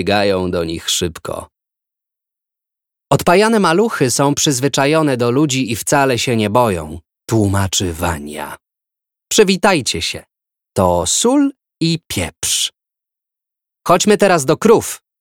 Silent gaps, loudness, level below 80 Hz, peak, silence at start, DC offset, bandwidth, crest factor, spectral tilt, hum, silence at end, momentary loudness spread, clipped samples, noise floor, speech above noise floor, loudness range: none; -15 LUFS; -44 dBFS; 0 dBFS; 0 s; under 0.1%; 17.5 kHz; 16 dB; -4 dB/octave; none; 0.25 s; 12 LU; under 0.1%; -84 dBFS; 70 dB; 4 LU